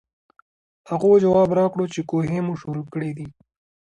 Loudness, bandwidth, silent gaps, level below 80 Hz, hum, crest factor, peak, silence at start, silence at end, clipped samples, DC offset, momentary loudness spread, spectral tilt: -21 LUFS; 9.4 kHz; none; -56 dBFS; none; 16 dB; -6 dBFS; 0.9 s; 0.7 s; under 0.1%; under 0.1%; 14 LU; -8 dB/octave